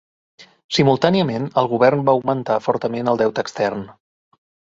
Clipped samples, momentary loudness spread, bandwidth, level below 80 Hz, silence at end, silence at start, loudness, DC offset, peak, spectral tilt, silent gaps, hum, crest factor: under 0.1%; 8 LU; 7.8 kHz; -56 dBFS; 0.8 s; 0.4 s; -18 LUFS; under 0.1%; 0 dBFS; -6 dB/octave; 0.64-0.69 s; none; 20 dB